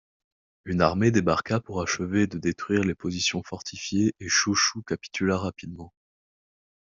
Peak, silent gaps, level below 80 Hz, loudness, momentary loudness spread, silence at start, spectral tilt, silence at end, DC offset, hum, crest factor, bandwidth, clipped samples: -4 dBFS; none; -58 dBFS; -25 LUFS; 12 LU; 0.65 s; -4 dB/octave; 1.1 s; under 0.1%; none; 22 dB; 7.8 kHz; under 0.1%